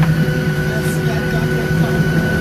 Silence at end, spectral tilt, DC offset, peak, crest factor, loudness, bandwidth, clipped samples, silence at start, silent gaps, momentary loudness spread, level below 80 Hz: 0 s; -6.5 dB/octave; under 0.1%; -4 dBFS; 12 dB; -17 LUFS; 14.5 kHz; under 0.1%; 0 s; none; 3 LU; -32 dBFS